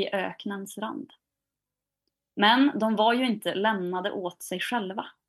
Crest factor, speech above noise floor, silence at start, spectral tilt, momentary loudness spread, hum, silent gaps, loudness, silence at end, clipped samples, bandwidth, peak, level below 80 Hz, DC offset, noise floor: 20 dB; 62 dB; 0 s; -4.5 dB/octave; 14 LU; 50 Hz at -50 dBFS; none; -26 LUFS; 0.2 s; under 0.1%; 12.5 kHz; -8 dBFS; -82 dBFS; under 0.1%; -88 dBFS